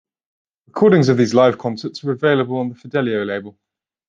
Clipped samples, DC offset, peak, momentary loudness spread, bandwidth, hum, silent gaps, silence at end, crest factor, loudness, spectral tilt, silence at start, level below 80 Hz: under 0.1%; under 0.1%; -2 dBFS; 12 LU; 7.6 kHz; none; none; 0.6 s; 16 dB; -17 LUFS; -7 dB/octave; 0.75 s; -62 dBFS